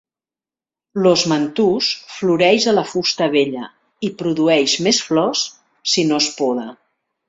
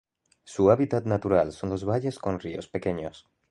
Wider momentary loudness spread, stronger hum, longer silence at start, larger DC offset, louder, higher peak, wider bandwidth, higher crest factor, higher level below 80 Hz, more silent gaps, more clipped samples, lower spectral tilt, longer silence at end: about the same, 12 LU vs 12 LU; neither; first, 0.95 s vs 0.45 s; neither; first, -17 LUFS vs -26 LUFS; first, -2 dBFS vs -6 dBFS; second, 8 kHz vs 11.5 kHz; second, 16 dB vs 22 dB; second, -62 dBFS vs -52 dBFS; neither; neither; second, -3.5 dB/octave vs -7.5 dB/octave; first, 0.55 s vs 0.3 s